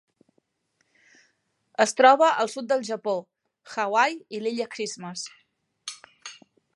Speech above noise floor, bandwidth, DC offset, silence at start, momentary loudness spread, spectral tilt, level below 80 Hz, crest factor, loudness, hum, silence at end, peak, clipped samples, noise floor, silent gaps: 50 dB; 11.5 kHz; under 0.1%; 1.8 s; 22 LU; -2.5 dB/octave; -84 dBFS; 22 dB; -24 LUFS; none; 0.4 s; -4 dBFS; under 0.1%; -73 dBFS; none